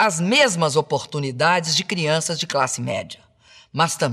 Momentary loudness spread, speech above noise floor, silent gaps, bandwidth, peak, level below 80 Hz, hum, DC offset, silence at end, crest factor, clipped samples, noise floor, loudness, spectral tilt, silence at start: 11 LU; 31 dB; none; 14 kHz; -6 dBFS; -66 dBFS; none; under 0.1%; 0 s; 16 dB; under 0.1%; -51 dBFS; -20 LUFS; -3.5 dB/octave; 0 s